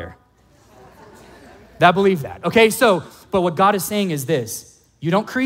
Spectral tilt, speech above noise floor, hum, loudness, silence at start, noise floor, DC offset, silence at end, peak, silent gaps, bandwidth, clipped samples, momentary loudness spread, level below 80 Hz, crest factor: -5 dB/octave; 37 dB; none; -18 LUFS; 0 s; -54 dBFS; under 0.1%; 0 s; 0 dBFS; none; 16.5 kHz; under 0.1%; 12 LU; -54 dBFS; 18 dB